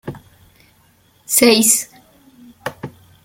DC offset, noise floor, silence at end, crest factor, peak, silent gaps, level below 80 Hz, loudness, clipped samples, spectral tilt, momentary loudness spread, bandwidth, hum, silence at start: under 0.1%; -55 dBFS; 0.35 s; 20 dB; 0 dBFS; none; -58 dBFS; -13 LUFS; under 0.1%; -2 dB/octave; 24 LU; 17 kHz; none; 0.05 s